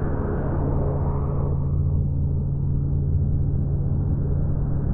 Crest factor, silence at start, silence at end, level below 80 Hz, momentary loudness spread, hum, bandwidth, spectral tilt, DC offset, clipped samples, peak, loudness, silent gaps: 10 dB; 0 s; 0 s; -28 dBFS; 2 LU; none; 2 kHz; -13.5 dB/octave; under 0.1%; under 0.1%; -12 dBFS; -24 LUFS; none